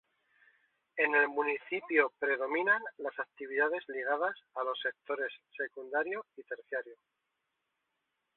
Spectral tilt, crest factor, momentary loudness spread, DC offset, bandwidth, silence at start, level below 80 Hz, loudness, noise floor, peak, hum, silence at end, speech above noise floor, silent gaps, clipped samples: 0 dB/octave; 24 dB; 12 LU; under 0.1%; 4.2 kHz; 0.95 s; -86 dBFS; -33 LUFS; -84 dBFS; -10 dBFS; none; 1.45 s; 50 dB; none; under 0.1%